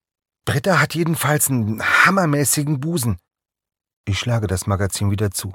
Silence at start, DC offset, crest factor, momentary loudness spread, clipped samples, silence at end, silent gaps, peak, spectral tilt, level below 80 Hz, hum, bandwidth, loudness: 0.45 s; under 0.1%; 18 dB; 10 LU; under 0.1%; 0 s; 3.93-4.04 s; 0 dBFS; -4.5 dB/octave; -48 dBFS; none; 17.5 kHz; -18 LUFS